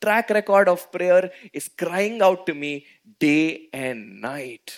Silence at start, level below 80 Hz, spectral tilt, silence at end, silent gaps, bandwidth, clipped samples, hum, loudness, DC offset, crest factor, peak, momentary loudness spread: 0 s; -74 dBFS; -5 dB/octave; 0 s; none; 16.5 kHz; under 0.1%; none; -21 LUFS; under 0.1%; 18 dB; -4 dBFS; 15 LU